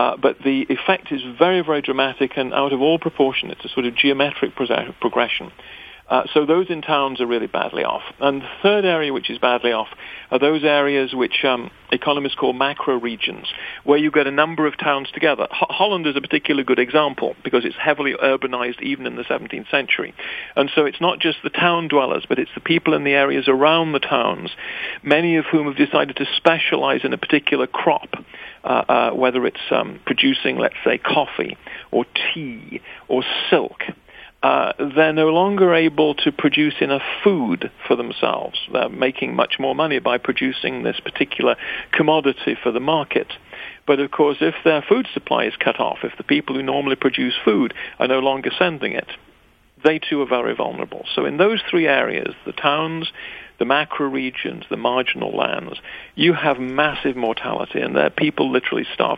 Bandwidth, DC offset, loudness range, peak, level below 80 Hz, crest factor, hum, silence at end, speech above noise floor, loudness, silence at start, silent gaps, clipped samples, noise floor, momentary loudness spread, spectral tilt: 5 kHz; under 0.1%; 3 LU; 0 dBFS; -58 dBFS; 18 dB; none; 0 s; 34 dB; -19 LUFS; 0 s; none; under 0.1%; -54 dBFS; 9 LU; -7 dB/octave